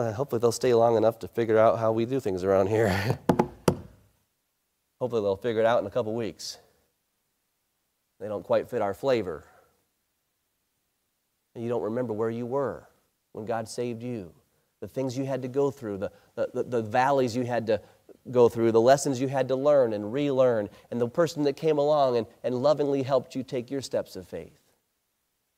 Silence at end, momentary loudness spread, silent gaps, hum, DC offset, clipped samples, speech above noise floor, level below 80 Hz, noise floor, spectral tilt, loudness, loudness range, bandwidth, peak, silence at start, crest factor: 1.1 s; 14 LU; none; none; under 0.1%; under 0.1%; 51 dB; -62 dBFS; -77 dBFS; -6 dB/octave; -26 LUFS; 9 LU; 16 kHz; -4 dBFS; 0 s; 22 dB